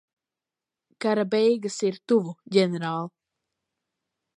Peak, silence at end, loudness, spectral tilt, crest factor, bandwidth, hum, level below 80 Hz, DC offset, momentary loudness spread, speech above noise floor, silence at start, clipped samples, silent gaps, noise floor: -6 dBFS; 1.3 s; -25 LUFS; -5.5 dB/octave; 20 dB; 11 kHz; none; -80 dBFS; under 0.1%; 8 LU; 65 dB; 1 s; under 0.1%; none; -89 dBFS